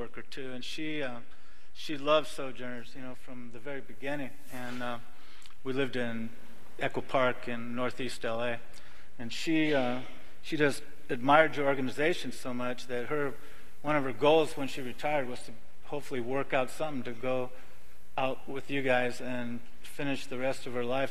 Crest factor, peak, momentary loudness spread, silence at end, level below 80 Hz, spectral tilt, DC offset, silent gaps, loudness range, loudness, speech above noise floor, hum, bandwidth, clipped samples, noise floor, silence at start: 26 dB; -8 dBFS; 16 LU; 0 s; -62 dBFS; -5 dB/octave; 3%; none; 8 LU; -33 LUFS; 24 dB; none; 14.5 kHz; under 0.1%; -57 dBFS; 0 s